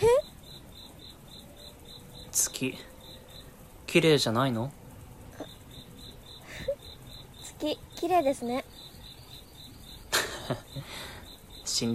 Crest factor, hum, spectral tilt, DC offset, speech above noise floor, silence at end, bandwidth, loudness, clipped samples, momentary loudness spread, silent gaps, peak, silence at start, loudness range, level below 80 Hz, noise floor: 22 dB; none; -3.5 dB/octave; under 0.1%; 22 dB; 0 s; 16 kHz; -29 LUFS; under 0.1%; 22 LU; none; -10 dBFS; 0 s; 7 LU; -54 dBFS; -49 dBFS